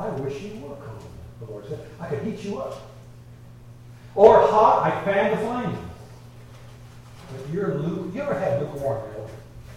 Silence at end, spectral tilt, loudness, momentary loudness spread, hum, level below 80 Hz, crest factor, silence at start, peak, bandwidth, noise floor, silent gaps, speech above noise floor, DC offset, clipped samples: 0 s; -7 dB/octave; -22 LUFS; 24 LU; none; -50 dBFS; 24 dB; 0 s; 0 dBFS; 13.5 kHz; -44 dBFS; none; 23 dB; under 0.1%; under 0.1%